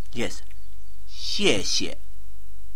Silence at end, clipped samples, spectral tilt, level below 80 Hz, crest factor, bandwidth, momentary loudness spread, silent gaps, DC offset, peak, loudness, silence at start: 0 s; under 0.1%; -2.5 dB/octave; -44 dBFS; 24 dB; 16.5 kHz; 21 LU; none; 10%; -8 dBFS; -25 LUFS; 0 s